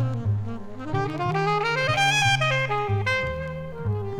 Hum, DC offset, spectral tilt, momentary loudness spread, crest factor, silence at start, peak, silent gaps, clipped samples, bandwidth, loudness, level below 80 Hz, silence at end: none; under 0.1%; -4.5 dB/octave; 12 LU; 16 dB; 0 s; -8 dBFS; none; under 0.1%; 16 kHz; -24 LUFS; -46 dBFS; 0 s